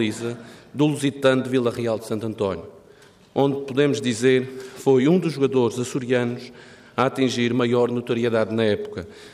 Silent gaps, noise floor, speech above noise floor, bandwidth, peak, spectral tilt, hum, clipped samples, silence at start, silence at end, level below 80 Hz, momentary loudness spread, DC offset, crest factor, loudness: none; -51 dBFS; 29 dB; 14.5 kHz; -6 dBFS; -6 dB/octave; none; under 0.1%; 0 s; 0.05 s; -64 dBFS; 12 LU; under 0.1%; 16 dB; -22 LUFS